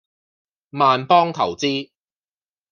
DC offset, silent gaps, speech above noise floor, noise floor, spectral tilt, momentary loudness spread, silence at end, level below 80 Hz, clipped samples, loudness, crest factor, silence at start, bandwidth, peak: under 0.1%; none; over 72 dB; under -90 dBFS; -5 dB/octave; 11 LU; 0.9 s; -72 dBFS; under 0.1%; -18 LUFS; 20 dB; 0.75 s; 7.4 kHz; -2 dBFS